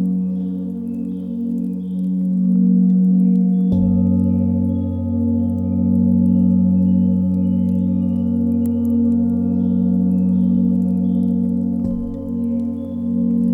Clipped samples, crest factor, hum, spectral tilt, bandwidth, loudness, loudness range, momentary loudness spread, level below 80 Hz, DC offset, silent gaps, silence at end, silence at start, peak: under 0.1%; 10 dB; none; -12.5 dB/octave; 1.3 kHz; -18 LUFS; 2 LU; 9 LU; -44 dBFS; under 0.1%; none; 0 s; 0 s; -6 dBFS